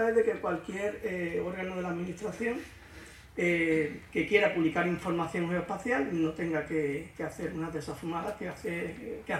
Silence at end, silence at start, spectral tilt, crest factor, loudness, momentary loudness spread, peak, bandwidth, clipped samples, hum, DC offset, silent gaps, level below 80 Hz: 0 s; 0 s; -6 dB/octave; 20 dB; -32 LUFS; 10 LU; -10 dBFS; 15 kHz; under 0.1%; none; under 0.1%; none; -58 dBFS